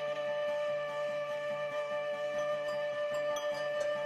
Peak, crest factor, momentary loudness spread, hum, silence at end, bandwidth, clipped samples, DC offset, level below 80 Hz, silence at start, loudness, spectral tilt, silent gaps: -24 dBFS; 12 dB; 2 LU; none; 0 s; 13 kHz; under 0.1%; under 0.1%; -78 dBFS; 0 s; -35 LUFS; -3 dB/octave; none